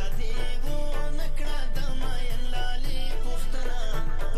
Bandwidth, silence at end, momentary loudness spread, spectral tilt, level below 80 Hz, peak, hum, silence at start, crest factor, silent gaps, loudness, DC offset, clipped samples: 11 kHz; 0 s; 1 LU; -4.5 dB/octave; -24 dBFS; -14 dBFS; none; 0 s; 8 dB; none; -34 LUFS; under 0.1%; under 0.1%